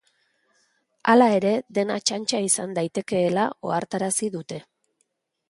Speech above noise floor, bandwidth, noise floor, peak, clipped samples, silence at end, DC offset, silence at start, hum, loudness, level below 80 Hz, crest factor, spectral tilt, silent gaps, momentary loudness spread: 51 dB; 11.5 kHz; -73 dBFS; -4 dBFS; under 0.1%; 0.9 s; under 0.1%; 1.05 s; none; -23 LUFS; -70 dBFS; 20 dB; -4 dB/octave; none; 11 LU